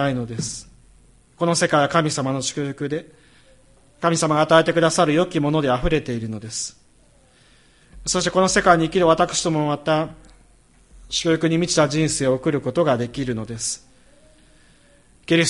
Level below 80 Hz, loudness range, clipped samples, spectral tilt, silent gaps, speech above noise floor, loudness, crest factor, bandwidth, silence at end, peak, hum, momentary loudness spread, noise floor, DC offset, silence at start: -44 dBFS; 4 LU; under 0.1%; -4.5 dB/octave; none; 35 dB; -20 LUFS; 20 dB; 11.5 kHz; 0 s; -2 dBFS; none; 12 LU; -54 dBFS; under 0.1%; 0 s